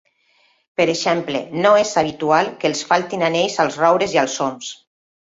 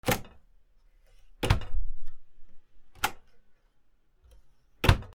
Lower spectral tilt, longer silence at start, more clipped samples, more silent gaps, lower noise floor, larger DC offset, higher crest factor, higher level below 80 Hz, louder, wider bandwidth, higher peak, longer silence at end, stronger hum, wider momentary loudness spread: about the same, -3.5 dB/octave vs -4.5 dB/octave; first, 0.8 s vs 0.05 s; neither; neither; about the same, -60 dBFS vs -62 dBFS; neither; second, 18 dB vs 26 dB; second, -60 dBFS vs -38 dBFS; first, -18 LUFS vs -31 LUFS; second, 8 kHz vs 16.5 kHz; about the same, -2 dBFS vs -4 dBFS; first, 0.45 s vs 0.1 s; neither; second, 9 LU vs 16 LU